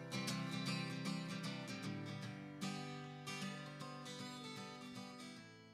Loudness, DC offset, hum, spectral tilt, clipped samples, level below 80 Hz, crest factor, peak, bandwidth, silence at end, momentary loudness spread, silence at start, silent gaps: -47 LUFS; under 0.1%; none; -4.5 dB/octave; under 0.1%; -82 dBFS; 18 dB; -28 dBFS; 15.5 kHz; 0 s; 9 LU; 0 s; none